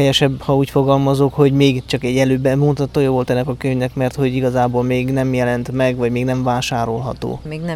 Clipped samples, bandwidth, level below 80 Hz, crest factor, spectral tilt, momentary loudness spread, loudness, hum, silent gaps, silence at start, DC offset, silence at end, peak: under 0.1%; 14.5 kHz; -40 dBFS; 14 dB; -6.5 dB/octave; 6 LU; -17 LUFS; none; none; 0 s; under 0.1%; 0 s; -2 dBFS